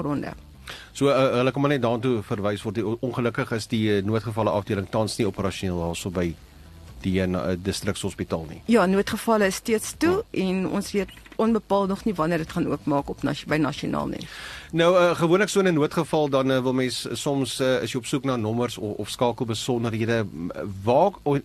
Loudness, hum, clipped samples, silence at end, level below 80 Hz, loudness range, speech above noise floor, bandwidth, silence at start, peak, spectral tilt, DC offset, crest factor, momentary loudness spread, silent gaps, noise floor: -24 LUFS; none; under 0.1%; 0.05 s; -50 dBFS; 4 LU; 21 dB; 13 kHz; 0 s; -8 dBFS; -5.5 dB/octave; under 0.1%; 16 dB; 10 LU; none; -45 dBFS